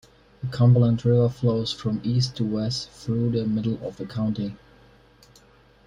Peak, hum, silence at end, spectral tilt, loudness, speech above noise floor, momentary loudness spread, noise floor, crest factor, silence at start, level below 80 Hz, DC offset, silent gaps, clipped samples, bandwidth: -8 dBFS; none; 1.3 s; -7.5 dB/octave; -24 LUFS; 32 dB; 12 LU; -55 dBFS; 16 dB; 0.4 s; -52 dBFS; under 0.1%; none; under 0.1%; 9.8 kHz